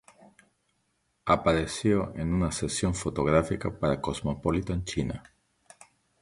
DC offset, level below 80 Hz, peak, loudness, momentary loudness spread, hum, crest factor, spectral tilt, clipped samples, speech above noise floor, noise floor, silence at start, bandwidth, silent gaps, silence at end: under 0.1%; -44 dBFS; -8 dBFS; -28 LUFS; 7 LU; none; 22 dB; -5.5 dB/octave; under 0.1%; 47 dB; -74 dBFS; 0.2 s; 11.5 kHz; none; 1 s